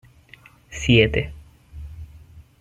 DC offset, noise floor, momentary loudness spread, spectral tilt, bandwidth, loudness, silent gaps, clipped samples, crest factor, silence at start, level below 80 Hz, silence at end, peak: under 0.1%; -50 dBFS; 25 LU; -5.5 dB/octave; 9.4 kHz; -19 LUFS; none; under 0.1%; 22 dB; 0.7 s; -38 dBFS; 0.2 s; -2 dBFS